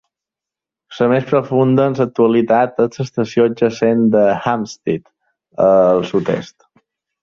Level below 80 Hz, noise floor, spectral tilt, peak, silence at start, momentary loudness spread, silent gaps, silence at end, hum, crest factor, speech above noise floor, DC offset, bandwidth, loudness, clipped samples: -56 dBFS; -87 dBFS; -7.5 dB/octave; -2 dBFS; 0.9 s; 9 LU; none; 0.8 s; none; 14 dB; 72 dB; under 0.1%; 7.2 kHz; -15 LUFS; under 0.1%